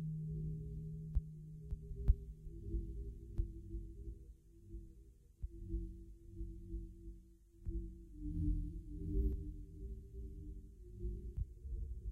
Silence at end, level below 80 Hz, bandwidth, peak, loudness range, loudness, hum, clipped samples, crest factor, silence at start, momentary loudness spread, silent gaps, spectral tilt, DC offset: 0 s; -44 dBFS; 1.1 kHz; -18 dBFS; 7 LU; -47 LUFS; none; under 0.1%; 26 dB; 0 s; 16 LU; none; -11 dB/octave; under 0.1%